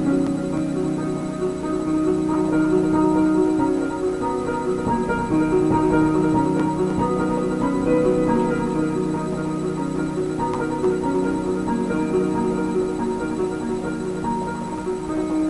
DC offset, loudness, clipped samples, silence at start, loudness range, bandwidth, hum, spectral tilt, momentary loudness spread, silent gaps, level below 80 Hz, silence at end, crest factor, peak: under 0.1%; -22 LUFS; under 0.1%; 0 s; 3 LU; 11.5 kHz; none; -7.5 dB/octave; 7 LU; none; -42 dBFS; 0 s; 14 dB; -8 dBFS